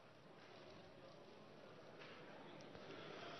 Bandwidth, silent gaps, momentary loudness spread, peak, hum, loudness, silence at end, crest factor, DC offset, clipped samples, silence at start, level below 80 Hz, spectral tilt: 6.2 kHz; none; 6 LU; -40 dBFS; none; -59 LUFS; 0 s; 18 dB; under 0.1%; under 0.1%; 0 s; -88 dBFS; -3 dB/octave